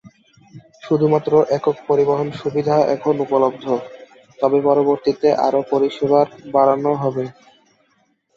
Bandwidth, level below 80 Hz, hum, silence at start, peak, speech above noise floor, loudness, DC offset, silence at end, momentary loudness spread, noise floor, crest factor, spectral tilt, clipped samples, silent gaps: 7.2 kHz; -62 dBFS; none; 0.05 s; -2 dBFS; 46 dB; -18 LUFS; under 0.1%; 1.05 s; 7 LU; -63 dBFS; 16 dB; -8 dB/octave; under 0.1%; none